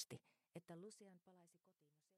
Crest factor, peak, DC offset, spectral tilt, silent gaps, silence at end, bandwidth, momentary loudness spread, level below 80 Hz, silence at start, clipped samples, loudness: 24 dB; -36 dBFS; under 0.1%; -4 dB/octave; none; 0 s; 13.5 kHz; 9 LU; under -90 dBFS; 0 s; under 0.1%; -60 LUFS